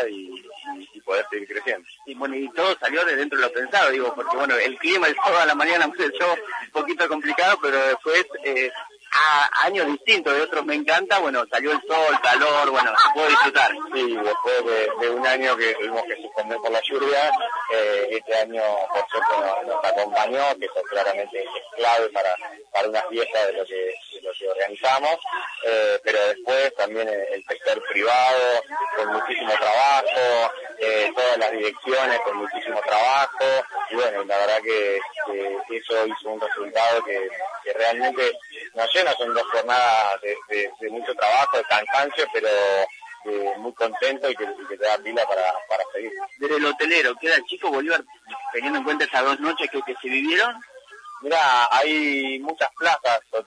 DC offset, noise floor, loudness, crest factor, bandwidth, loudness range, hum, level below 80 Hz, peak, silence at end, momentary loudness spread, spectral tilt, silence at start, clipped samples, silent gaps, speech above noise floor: under 0.1%; -42 dBFS; -21 LUFS; 18 dB; 10.5 kHz; 5 LU; none; -78 dBFS; -4 dBFS; 0.05 s; 11 LU; -1.5 dB/octave; 0 s; under 0.1%; none; 20 dB